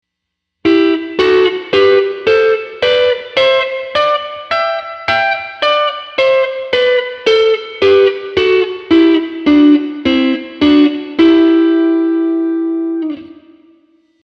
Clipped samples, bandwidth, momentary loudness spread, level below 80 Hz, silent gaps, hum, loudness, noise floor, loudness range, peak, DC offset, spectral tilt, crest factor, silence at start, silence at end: under 0.1%; 6.8 kHz; 7 LU; -48 dBFS; none; none; -12 LUFS; -76 dBFS; 3 LU; 0 dBFS; under 0.1%; -5 dB/octave; 12 dB; 0.65 s; 0.95 s